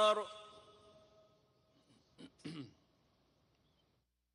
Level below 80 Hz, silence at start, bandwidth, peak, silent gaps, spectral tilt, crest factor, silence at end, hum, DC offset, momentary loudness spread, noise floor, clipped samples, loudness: -84 dBFS; 0 s; 11 kHz; -20 dBFS; none; -3.5 dB/octave; 22 dB; 1.65 s; none; under 0.1%; 25 LU; -81 dBFS; under 0.1%; -41 LUFS